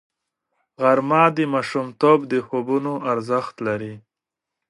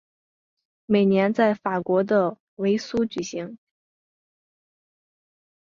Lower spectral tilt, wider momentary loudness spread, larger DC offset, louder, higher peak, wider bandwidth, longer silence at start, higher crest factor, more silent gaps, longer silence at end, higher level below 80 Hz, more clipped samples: about the same, -7 dB/octave vs -6.5 dB/octave; about the same, 9 LU vs 11 LU; neither; first, -20 LUFS vs -23 LUFS; first, -2 dBFS vs -6 dBFS; first, 11.5 kHz vs 7.4 kHz; about the same, 0.8 s vs 0.9 s; about the same, 18 dB vs 18 dB; second, none vs 2.40-2.57 s; second, 0.7 s vs 2.05 s; about the same, -68 dBFS vs -64 dBFS; neither